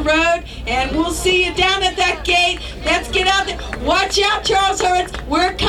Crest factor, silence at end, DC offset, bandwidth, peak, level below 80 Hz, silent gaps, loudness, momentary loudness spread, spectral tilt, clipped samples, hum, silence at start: 14 dB; 0 s; under 0.1%; 16 kHz; -4 dBFS; -32 dBFS; none; -16 LUFS; 6 LU; -3 dB/octave; under 0.1%; none; 0 s